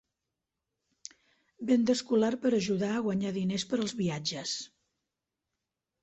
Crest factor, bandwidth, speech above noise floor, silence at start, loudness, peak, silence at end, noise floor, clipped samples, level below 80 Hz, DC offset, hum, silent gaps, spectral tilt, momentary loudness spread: 18 dB; 8.4 kHz; 58 dB; 1.6 s; -30 LUFS; -14 dBFS; 1.35 s; -87 dBFS; under 0.1%; -70 dBFS; under 0.1%; none; none; -5 dB/octave; 21 LU